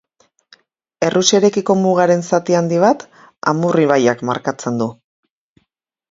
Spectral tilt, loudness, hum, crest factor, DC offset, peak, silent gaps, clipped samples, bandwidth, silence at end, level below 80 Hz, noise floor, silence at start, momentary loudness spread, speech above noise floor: -5 dB/octave; -16 LUFS; none; 16 dB; under 0.1%; 0 dBFS; none; under 0.1%; 7.8 kHz; 1.2 s; -60 dBFS; -70 dBFS; 1 s; 8 LU; 56 dB